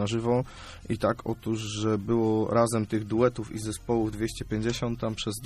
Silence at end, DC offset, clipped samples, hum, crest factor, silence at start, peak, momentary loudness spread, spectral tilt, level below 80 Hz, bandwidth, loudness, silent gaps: 0 s; under 0.1%; under 0.1%; none; 18 dB; 0 s; -10 dBFS; 9 LU; -6 dB/octave; -48 dBFS; 14 kHz; -28 LUFS; none